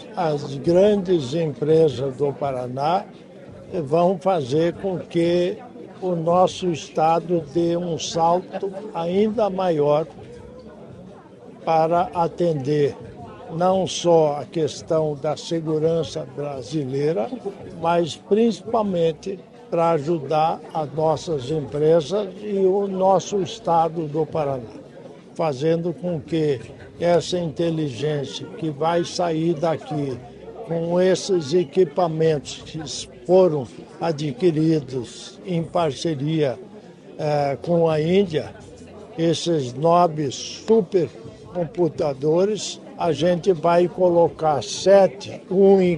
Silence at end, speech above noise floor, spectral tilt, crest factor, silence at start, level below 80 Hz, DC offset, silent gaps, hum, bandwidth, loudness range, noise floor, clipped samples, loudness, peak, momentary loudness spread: 0 s; 22 dB; -6 dB/octave; 18 dB; 0 s; -56 dBFS; under 0.1%; none; none; 11 kHz; 3 LU; -43 dBFS; under 0.1%; -21 LUFS; -4 dBFS; 14 LU